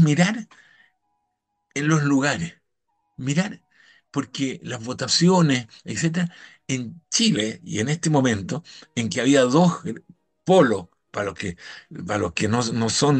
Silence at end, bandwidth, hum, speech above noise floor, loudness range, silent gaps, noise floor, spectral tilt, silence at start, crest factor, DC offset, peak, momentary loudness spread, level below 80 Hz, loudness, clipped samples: 0 s; 9.6 kHz; none; 54 dB; 5 LU; none; -76 dBFS; -5 dB/octave; 0 s; 18 dB; under 0.1%; -4 dBFS; 15 LU; -60 dBFS; -22 LUFS; under 0.1%